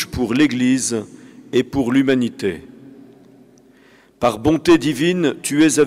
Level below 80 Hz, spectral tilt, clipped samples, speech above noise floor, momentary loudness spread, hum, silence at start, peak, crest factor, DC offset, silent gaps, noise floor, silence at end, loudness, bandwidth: -48 dBFS; -4.5 dB/octave; under 0.1%; 34 dB; 10 LU; none; 0 s; -6 dBFS; 12 dB; under 0.1%; none; -50 dBFS; 0 s; -18 LUFS; 15.5 kHz